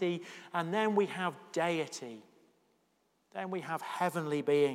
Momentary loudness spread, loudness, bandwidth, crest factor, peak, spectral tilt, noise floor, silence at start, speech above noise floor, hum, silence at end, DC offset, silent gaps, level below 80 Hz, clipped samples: 13 LU; -34 LUFS; 15.5 kHz; 18 dB; -16 dBFS; -5.5 dB/octave; -75 dBFS; 0 s; 42 dB; none; 0 s; under 0.1%; none; under -90 dBFS; under 0.1%